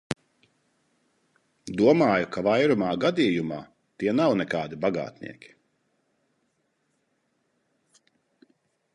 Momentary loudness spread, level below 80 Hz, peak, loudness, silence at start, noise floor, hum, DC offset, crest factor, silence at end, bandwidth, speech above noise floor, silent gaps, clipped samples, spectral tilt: 16 LU; -64 dBFS; -8 dBFS; -24 LUFS; 0.1 s; -73 dBFS; none; under 0.1%; 20 dB; 3.65 s; 11 kHz; 50 dB; none; under 0.1%; -6.5 dB/octave